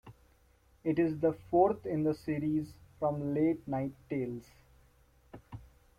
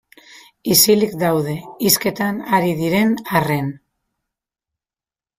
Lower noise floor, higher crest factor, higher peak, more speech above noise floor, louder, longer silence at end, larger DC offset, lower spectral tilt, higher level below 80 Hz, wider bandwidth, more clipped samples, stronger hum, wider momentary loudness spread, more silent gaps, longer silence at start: second, -66 dBFS vs under -90 dBFS; about the same, 20 dB vs 20 dB; second, -14 dBFS vs 0 dBFS; second, 34 dB vs over 73 dB; second, -33 LUFS vs -17 LUFS; second, 0.35 s vs 1.6 s; neither; first, -9.5 dB/octave vs -4 dB/octave; second, -62 dBFS vs -56 dBFS; second, 12 kHz vs 16 kHz; neither; neither; first, 18 LU vs 10 LU; neither; second, 0.05 s vs 0.65 s